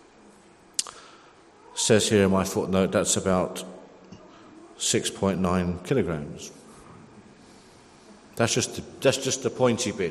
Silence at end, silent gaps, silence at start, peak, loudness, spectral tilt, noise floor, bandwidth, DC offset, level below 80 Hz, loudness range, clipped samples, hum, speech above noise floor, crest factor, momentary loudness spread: 0 s; none; 0.8 s; -2 dBFS; -25 LUFS; -4 dB/octave; -53 dBFS; 13 kHz; under 0.1%; -60 dBFS; 6 LU; under 0.1%; none; 29 dB; 26 dB; 16 LU